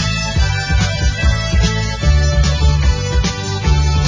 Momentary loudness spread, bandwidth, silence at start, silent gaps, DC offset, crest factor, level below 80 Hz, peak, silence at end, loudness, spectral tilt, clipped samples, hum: 3 LU; 7.6 kHz; 0 s; none; under 0.1%; 12 dB; -16 dBFS; -2 dBFS; 0 s; -16 LUFS; -4.5 dB/octave; under 0.1%; none